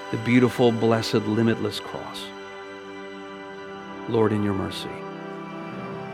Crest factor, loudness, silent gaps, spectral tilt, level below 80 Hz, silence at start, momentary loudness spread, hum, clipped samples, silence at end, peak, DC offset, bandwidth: 18 dB; -24 LUFS; none; -6.5 dB/octave; -62 dBFS; 0 s; 18 LU; none; under 0.1%; 0 s; -6 dBFS; under 0.1%; 15.5 kHz